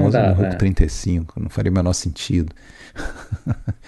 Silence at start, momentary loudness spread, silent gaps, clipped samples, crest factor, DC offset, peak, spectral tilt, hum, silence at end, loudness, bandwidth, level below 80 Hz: 0 s; 15 LU; none; under 0.1%; 20 dB; under 0.1%; 0 dBFS; -6.5 dB/octave; none; 0.1 s; -21 LUFS; 12 kHz; -28 dBFS